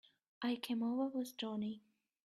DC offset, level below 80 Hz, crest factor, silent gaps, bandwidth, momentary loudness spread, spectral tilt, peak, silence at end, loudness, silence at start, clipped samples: under 0.1%; -86 dBFS; 14 dB; none; 14 kHz; 7 LU; -5 dB/octave; -28 dBFS; 0.45 s; -41 LUFS; 0.4 s; under 0.1%